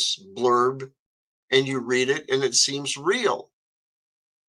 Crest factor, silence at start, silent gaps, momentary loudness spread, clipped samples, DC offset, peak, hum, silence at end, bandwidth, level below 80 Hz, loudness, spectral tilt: 22 dB; 0 s; 0.99-1.48 s; 6 LU; under 0.1%; under 0.1%; -4 dBFS; none; 1.05 s; 12.5 kHz; -74 dBFS; -23 LUFS; -2.5 dB/octave